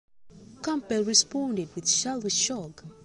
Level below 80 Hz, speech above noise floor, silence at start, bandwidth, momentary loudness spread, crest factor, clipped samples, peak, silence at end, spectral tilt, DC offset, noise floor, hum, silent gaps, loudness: -64 dBFS; 22 dB; 0.2 s; 11.5 kHz; 13 LU; 22 dB; under 0.1%; -6 dBFS; 0.1 s; -2 dB/octave; under 0.1%; -50 dBFS; none; none; -26 LUFS